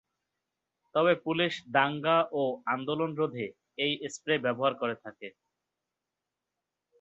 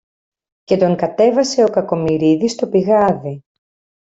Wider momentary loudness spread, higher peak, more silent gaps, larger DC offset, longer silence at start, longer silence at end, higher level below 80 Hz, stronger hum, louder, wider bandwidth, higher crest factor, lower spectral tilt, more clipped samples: first, 12 LU vs 6 LU; second, -10 dBFS vs -2 dBFS; neither; neither; first, 0.95 s vs 0.7 s; first, 1.7 s vs 0.65 s; second, -76 dBFS vs -54 dBFS; neither; second, -29 LUFS vs -15 LUFS; about the same, 8.2 kHz vs 8 kHz; first, 22 dB vs 16 dB; about the same, -5 dB/octave vs -6 dB/octave; neither